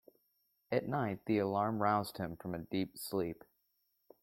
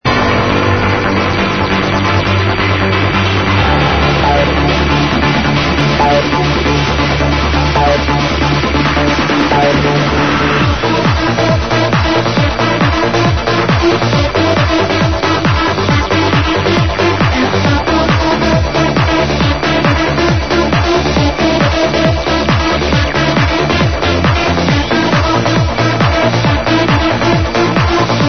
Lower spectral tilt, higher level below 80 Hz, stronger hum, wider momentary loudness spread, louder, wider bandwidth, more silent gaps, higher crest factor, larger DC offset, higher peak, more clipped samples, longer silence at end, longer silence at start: about the same, -6.5 dB/octave vs -5.5 dB/octave; second, -70 dBFS vs -22 dBFS; neither; first, 10 LU vs 2 LU; second, -37 LUFS vs -11 LUFS; first, 16.5 kHz vs 6.6 kHz; neither; first, 20 dB vs 12 dB; second, under 0.1% vs 2%; second, -16 dBFS vs 0 dBFS; neither; first, 0.9 s vs 0 s; first, 0.7 s vs 0 s